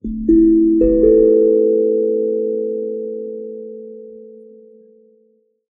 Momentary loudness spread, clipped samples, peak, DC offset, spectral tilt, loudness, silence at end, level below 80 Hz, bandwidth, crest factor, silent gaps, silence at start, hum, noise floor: 20 LU; under 0.1%; -2 dBFS; under 0.1%; -15 dB/octave; -14 LUFS; 1.4 s; -36 dBFS; 1.9 kHz; 14 dB; none; 0.05 s; none; -58 dBFS